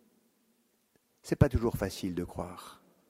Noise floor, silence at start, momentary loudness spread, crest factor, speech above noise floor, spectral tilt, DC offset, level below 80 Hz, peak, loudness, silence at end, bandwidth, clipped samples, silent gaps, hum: -72 dBFS; 1.25 s; 22 LU; 24 dB; 41 dB; -7 dB/octave; under 0.1%; -46 dBFS; -10 dBFS; -32 LUFS; 0.35 s; 16 kHz; under 0.1%; none; none